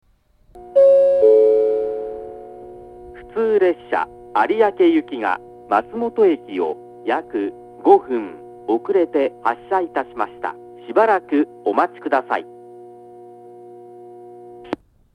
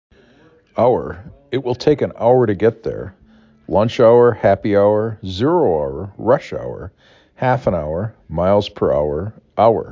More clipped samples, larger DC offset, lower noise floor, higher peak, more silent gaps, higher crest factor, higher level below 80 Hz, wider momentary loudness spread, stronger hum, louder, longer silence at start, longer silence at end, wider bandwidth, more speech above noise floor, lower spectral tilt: neither; neither; first, -55 dBFS vs -51 dBFS; about the same, 0 dBFS vs -2 dBFS; neither; about the same, 18 dB vs 16 dB; second, -58 dBFS vs -40 dBFS; first, 20 LU vs 14 LU; neither; about the same, -19 LUFS vs -17 LUFS; second, 0.55 s vs 0.75 s; first, 0.4 s vs 0 s; second, 5.4 kHz vs 7.4 kHz; about the same, 37 dB vs 35 dB; second, -6.5 dB/octave vs -8 dB/octave